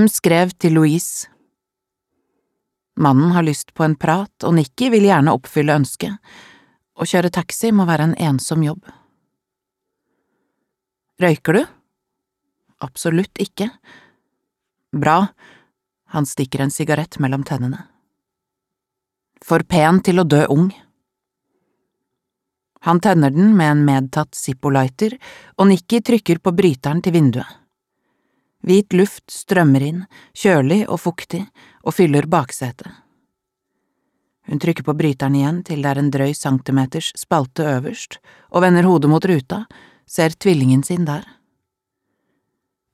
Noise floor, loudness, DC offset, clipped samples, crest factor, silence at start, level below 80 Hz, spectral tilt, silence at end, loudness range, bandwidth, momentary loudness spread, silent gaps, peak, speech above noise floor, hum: -83 dBFS; -17 LUFS; under 0.1%; under 0.1%; 18 dB; 0 s; -58 dBFS; -6.5 dB/octave; 1.7 s; 7 LU; 15 kHz; 14 LU; none; 0 dBFS; 66 dB; none